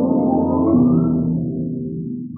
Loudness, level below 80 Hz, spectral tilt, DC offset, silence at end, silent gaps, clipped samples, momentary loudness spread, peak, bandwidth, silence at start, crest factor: -18 LUFS; -48 dBFS; -17 dB/octave; under 0.1%; 0 s; none; under 0.1%; 11 LU; -4 dBFS; 1.4 kHz; 0 s; 14 dB